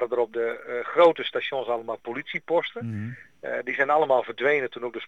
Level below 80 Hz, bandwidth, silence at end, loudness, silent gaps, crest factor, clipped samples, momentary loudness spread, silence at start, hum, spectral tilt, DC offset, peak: -76 dBFS; 6.6 kHz; 0 s; -25 LUFS; none; 18 dB; under 0.1%; 13 LU; 0 s; none; -6.5 dB/octave; 0.1%; -6 dBFS